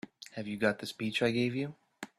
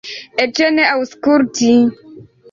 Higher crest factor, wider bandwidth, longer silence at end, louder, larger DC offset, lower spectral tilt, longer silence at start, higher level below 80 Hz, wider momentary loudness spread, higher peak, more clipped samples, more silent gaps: first, 20 dB vs 12 dB; first, 14 kHz vs 7.4 kHz; second, 0.1 s vs 0.3 s; second, -33 LUFS vs -14 LUFS; neither; first, -5.5 dB/octave vs -3.5 dB/octave; first, 0.2 s vs 0.05 s; second, -70 dBFS vs -56 dBFS; first, 13 LU vs 6 LU; second, -14 dBFS vs -2 dBFS; neither; neither